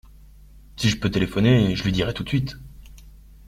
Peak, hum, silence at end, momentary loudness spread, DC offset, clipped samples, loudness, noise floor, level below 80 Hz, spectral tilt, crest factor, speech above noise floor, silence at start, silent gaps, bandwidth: -4 dBFS; none; 0.4 s; 8 LU; under 0.1%; under 0.1%; -22 LUFS; -47 dBFS; -40 dBFS; -6 dB/octave; 20 dB; 26 dB; 0.55 s; none; 14.5 kHz